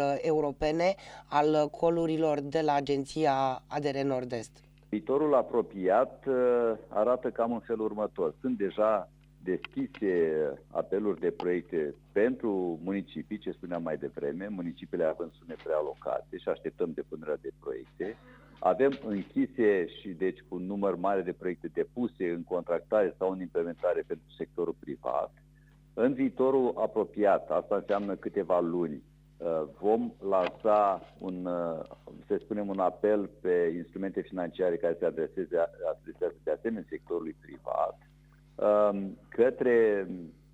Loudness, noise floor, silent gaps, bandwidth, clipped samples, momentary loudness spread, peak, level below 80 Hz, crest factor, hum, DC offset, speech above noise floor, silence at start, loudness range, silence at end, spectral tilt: -31 LUFS; -58 dBFS; none; 10 kHz; under 0.1%; 11 LU; -12 dBFS; -60 dBFS; 18 dB; none; under 0.1%; 28 dB; 0 s; 6 LU; 0.2 s; -7 dB/octave